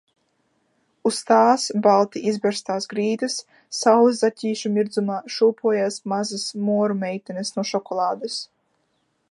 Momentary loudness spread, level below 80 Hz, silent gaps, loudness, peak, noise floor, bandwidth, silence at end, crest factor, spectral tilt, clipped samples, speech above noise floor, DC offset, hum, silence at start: 12 LU; -78 dBFS; none; -22 LUFS; -2 dBFS; -70 dBFS; 11.5 kHz; 0.85 s; 20 dB; -4.5 dB/octave; under 0.1%; 49 dB; under 0.1%; none; 1.05 s